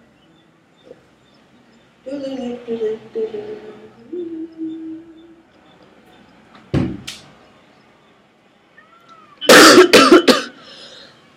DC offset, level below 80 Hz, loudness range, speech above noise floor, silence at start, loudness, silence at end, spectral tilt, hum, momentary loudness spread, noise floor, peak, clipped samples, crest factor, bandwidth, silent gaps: under 0.1%; -50 dBFS; 18 LU; 28 dB; 2.05 s; -12 LUFS; 0.9 s; -3 dB/octave; none; 27 LU; -53 dBFS; 0 dBFS; 0.2%; 18 dB; 17 kHz; none